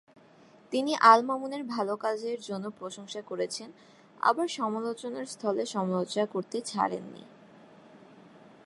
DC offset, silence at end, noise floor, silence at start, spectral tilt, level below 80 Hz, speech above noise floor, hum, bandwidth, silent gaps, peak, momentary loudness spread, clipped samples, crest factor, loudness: under 0.1%; 0.7 s; -57 dBFS; 0.7 s; -4.5 dB/octave; -82 dBFS; 28 dB; none; 11.5 kHz; none; -6 dBFS; 17 LU; under 0.1%; 26 dB; -29 LUFS